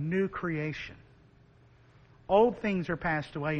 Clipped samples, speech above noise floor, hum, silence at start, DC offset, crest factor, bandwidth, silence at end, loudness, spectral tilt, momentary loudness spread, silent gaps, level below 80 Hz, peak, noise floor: under 0.1%; 30 dB; none; 0 s; under 0.1%; 20 dB; 8.4 kHz; 0 s; -30 LUFS; -8 dB/octave; 15 LU; none; -56 dBFS; -12 dBFS; -59 dBFS